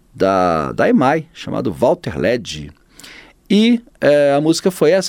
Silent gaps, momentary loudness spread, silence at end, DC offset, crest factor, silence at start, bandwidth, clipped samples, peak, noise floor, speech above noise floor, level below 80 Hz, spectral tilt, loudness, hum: none; 9 LU; 0 s; under 0.1%; 14 dB; 0.15 s; 16.5 kHz; under 0.1%; -2 dBFS; -41 dBFS; 26 dB; -46 dBFS; -5.5 dB/octave; -16 LUFS; none